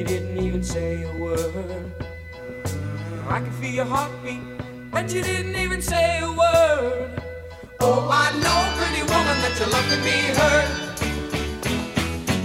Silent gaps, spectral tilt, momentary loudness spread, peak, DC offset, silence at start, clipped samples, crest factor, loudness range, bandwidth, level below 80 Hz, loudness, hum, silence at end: none; -4 dB/octave; 14 LU; -4 dBFS; under 0.1%; 0 s; under 0.1%; 18 dB; 9 LU; 16 kHz; -36 dBFS; -22 LUFS; none; 0 s